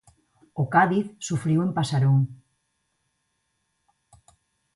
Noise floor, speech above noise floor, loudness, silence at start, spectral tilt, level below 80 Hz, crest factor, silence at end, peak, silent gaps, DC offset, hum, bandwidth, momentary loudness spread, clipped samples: -75 dBFS; 53 dB; -23 LUFS; 0.55 s; -6.5 dB/octave; -64 dBFS; 22 dB; 2.4 s; -6 dBFS; none; under 0.1%; none; 11.5 kHz; 10 LU; under 0.1%